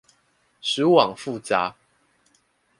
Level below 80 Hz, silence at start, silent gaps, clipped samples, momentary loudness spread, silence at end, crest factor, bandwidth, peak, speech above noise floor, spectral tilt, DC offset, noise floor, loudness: -66 dBFS; 0.65 s; none; under 0.1%; 13 LU; 1.1 s; 24 dB; 11.5 kHz; -2 dBFS; 44 dB; -4.5 dB/octave; under 0.1%; -65 dBFS; -22 LUFS